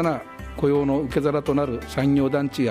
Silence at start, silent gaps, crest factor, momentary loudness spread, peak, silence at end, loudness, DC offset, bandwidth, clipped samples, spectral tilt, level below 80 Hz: 0 s; none; 14 dB; 6 LU; -8 dBFS; 0 s; -23 LUFS; under 0.1%; 15 kHz; under 0.1%; -7.5 dB/octave; -44 dBFS